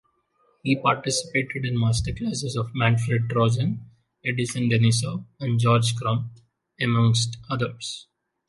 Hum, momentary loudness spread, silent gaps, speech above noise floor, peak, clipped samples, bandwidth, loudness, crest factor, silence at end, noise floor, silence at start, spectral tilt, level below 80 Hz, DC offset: none; 11 LU; none; 43 dB; -6 dBFS; under 0.1%; 11.5 kHz; -24 LUFS; 18 dB; 0.45 s; -66 dBFS; 0.65 s; -5 dB/octave; -48 dBFS; under 0.1%